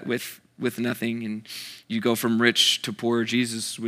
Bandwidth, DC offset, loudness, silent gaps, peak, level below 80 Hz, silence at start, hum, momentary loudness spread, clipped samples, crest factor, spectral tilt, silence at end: 16 kHz; under 0.1%; -24 LUFS; none; -4 dBFS; -80 dBFS; 0 s; none; 14 LU; under 0.1%; 22 dB; -3 dB/octave; 0 s